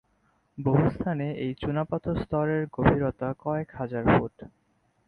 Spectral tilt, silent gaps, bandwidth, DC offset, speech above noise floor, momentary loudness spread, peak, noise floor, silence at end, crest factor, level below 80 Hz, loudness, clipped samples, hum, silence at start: -10.5 dB/octave; none; 4.9 kHz; under 0.1%; 42 dB; 8 LU; -4 dBFS; -68 dBFS; 0.6 s; 22 dB; -46 dBFS; -27 LUFS; under 0.1%; none; 0.55 s